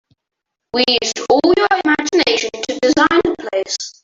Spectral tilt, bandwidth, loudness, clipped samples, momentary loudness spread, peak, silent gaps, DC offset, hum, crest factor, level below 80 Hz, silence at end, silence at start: -2.5 dB/octave; 7.8 kHz; -15 LUFS; under 0.1%; 9 LU; -2 dBFS; none; under 0.1%; none; 16 dB; -50 dBFS; 0.15 s; 0.75 s